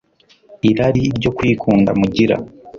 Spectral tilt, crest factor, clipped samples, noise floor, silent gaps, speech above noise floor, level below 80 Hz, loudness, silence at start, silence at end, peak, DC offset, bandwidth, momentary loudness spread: -7.5 dB/octave; 14 dB; under 0.1%; -51 dBFS; none; 36 dB; -42 dBFS; -16 LUFS; 0.5 s; 0 s; -2 dBFS; under 0.1%; 7.2 kHz; 4 LU